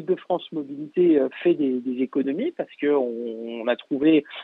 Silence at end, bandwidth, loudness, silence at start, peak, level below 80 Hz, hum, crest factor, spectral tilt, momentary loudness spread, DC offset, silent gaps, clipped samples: 0 s; 4.1 kHz; -24 LUFS; 0 s; -8 dBFS; -76 dBFS; none; 14 dB; -9 dB/octave; 10 LU; under 0.1%; none; under 0.1%